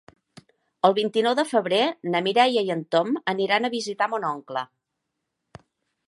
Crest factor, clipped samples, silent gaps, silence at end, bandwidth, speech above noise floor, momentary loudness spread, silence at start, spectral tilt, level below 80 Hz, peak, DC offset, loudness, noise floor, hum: 22 dB; under 0.1%; none; 1.4 s; 11.5 kHz; 58 dB; 9 LU; 0.85 s; -4.5 dB/octave; -72 dBFS; -2 dBFS; under 0.1%; -23 LUFS; -81 dBFS; none